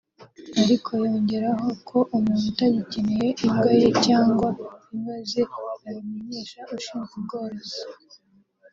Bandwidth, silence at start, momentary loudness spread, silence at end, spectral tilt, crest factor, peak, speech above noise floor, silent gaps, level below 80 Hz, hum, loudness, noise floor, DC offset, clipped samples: 7.6 kHz; 0.2 s; 16 LU; 0.8 s; -6 dB/octave; 18 dB; -6 dBFS; 34 dB; none; -58 dBFS; none; -24 LUFS; -57 dBFS; under 0.1%; under 0.1%